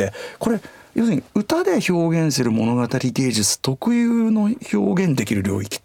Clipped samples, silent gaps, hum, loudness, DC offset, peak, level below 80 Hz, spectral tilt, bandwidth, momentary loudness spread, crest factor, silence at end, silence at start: under 0.1%; none; none; -20 LUFS; under 0.1%; -6 dBFS; -58 dBFS; -5 dB/octave; 17 kHz; 5 LU; 14 dB; 0.05 s; 0 s